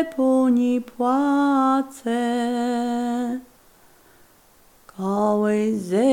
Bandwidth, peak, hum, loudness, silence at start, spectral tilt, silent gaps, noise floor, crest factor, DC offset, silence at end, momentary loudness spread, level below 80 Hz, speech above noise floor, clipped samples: 16 kHz; -8 dBFS; none; -21 LUFS; 0 s; -6 dB/octave; none; -54 dBFS; 14 dB; under 0.1%; 0 s; 8 LU; -64 dBFS; 34 dB; under 0.1%